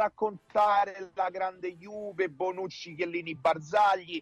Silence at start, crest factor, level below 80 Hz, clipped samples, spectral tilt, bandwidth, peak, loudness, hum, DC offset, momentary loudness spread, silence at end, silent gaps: 0 s; 14 dB; -72 dBFS; under 0.1%; -5 dB/octave; 9.8 kHz; -16 dBFS; -30 LUFS; none; under 0.1%; 13 LU; 0 s; none